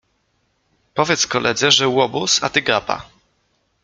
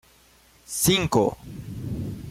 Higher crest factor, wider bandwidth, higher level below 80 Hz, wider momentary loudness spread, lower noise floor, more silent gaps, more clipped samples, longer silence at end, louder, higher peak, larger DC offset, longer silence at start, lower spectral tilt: about the same, 20 dB vs 18 dB; second, 10 kHz vs 16.5 kHz; second, -56 dBFS vs -48 dBFS; second, 11 LU vs 16 LU; first, -66 dBFS vs -56 dBFS; neither; neither; first, 0.8 s vs 0 s; first, -17 LUFS vs -24 LUFS; first, 0 dBFS vs -8 dBFS; neither; first, 0.95 s vs 0.7 s; second, -2 dB/octave vs -4 dB/octave